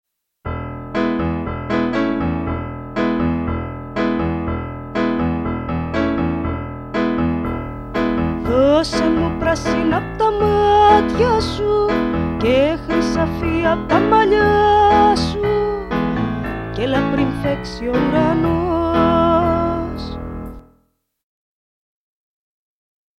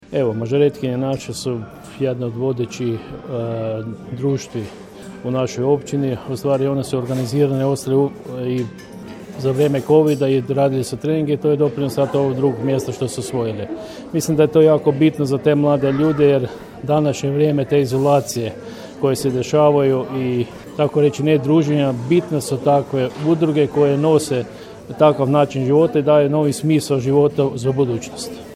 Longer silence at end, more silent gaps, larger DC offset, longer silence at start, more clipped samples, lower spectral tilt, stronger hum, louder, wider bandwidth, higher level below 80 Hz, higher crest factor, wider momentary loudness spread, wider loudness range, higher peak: first, 2.6 s vs 0 s; neither; neither; first, 0.45 s vs 0.1 s; neither; about the same, -7 dB/octave vs -7 dB/octave; neither; about the same, -18 LUFS vs -18 LUFS; second, 12.5 kHz vs 16 kHz; first, -34 dBFS vs -52 dBFS; about the same, 18 dB vs 18 dB; about the same, 12 LU vs 13 LU; about the same, 6 LU vs 6 LU; about the same, 0 dBFS vs 0 dBFS